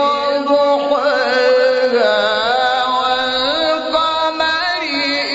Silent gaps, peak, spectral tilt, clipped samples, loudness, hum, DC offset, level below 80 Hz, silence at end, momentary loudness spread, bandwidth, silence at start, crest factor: none; -2 dBFS; -2.5 dB/octave; under 0.1%; -15 LUFS; none; under 0.1%; -52 dBFS; 0 s; 3 LU; 8 kHz; 0 s; 12 dB